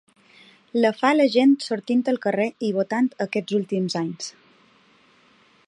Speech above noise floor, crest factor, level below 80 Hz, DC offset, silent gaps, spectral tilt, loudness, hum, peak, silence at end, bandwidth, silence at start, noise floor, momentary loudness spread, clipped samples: 36 dB; 18 dB; -76 dBFS; under 0.1%; none; -5.5 dB/octave; -22 LUFS; none; -6 dBFS; 1.4 s; 11 kHz; 0.75 s; -57 dBFS; 10 LU; under 0.1%